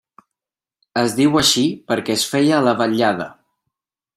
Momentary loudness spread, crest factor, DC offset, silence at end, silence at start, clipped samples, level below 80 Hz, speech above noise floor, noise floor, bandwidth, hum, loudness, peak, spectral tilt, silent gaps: 10 LU; 18 dB; under 0.1%; 0.85 s; 0.95 s; under 0.1%; -54 dBFS; 73 dB; -90 dBFS; 16 kHz; none; -17 LUFS; 0 dBFS; -3.5 dB/octave; none